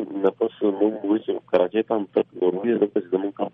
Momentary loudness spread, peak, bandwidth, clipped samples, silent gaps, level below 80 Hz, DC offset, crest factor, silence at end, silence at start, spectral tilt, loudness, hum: 3 LU; -6 dBFS; 4 kHz; under 0.1%; none; -72 dBFS; under 0.1%; 16 dB; 0.05 s; 0 s; -9.5 dB/octave; -23 LUFS; none